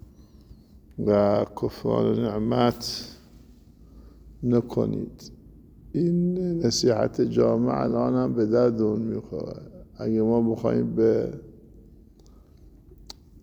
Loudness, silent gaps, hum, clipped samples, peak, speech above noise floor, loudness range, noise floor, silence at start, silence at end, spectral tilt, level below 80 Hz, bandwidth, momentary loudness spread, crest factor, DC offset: -24 LUFS; none; none; under 0.1%; -8 dBFS; 28 dB; 5 LU; -52 dBFS; 0.5 s; 0.3 s; -6.5 dB/octave; -50 dBFS; over 20 kHz; 18 LU; 18 dB; under 0.1%